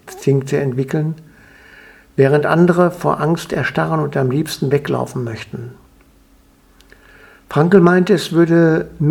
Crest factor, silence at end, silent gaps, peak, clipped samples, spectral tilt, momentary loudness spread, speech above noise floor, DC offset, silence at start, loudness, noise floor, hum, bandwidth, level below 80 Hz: 16 dB; 0 s; none; 0 dBFS; under 0.1%; -7 dB/octave; 13 LU; 36 dB; under 0.1%; 0.05 s; -16 LUFS; -50 dBFS; none; 15 kHz; -50 dBFS